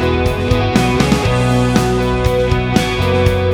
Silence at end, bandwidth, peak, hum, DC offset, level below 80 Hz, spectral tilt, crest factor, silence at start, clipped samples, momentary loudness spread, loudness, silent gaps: 0 s; 20 kHz; 0 dBFS; none; under 0.1%; -24 dBFS; -6 dB/octave; 14 dB; 0 s; under 0.1%; 2 LU; -14 LUFS; none